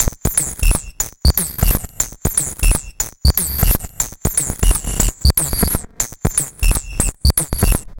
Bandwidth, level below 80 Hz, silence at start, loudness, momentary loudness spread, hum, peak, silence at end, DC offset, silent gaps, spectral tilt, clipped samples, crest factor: 17.5 kHz; -20 dBFS; 0 s; -17 LUFS; 5 LU; none; 0 dBFS; 0 s; under 0.1%; none; -3.5 dB/octave; under 0.1%; 16 dB